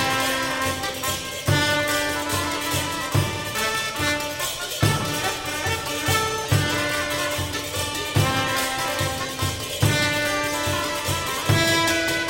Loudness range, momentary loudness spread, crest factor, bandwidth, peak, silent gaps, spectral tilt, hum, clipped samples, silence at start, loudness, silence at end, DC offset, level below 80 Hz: 1 LU; 6 LU; 18 dB; 17 kHz; -4 dBFS; none; -3.5 dB/octave; none; under 0.1%; 0 s; -23 LUFS; 0 s; under 0.1%; -44 dBFS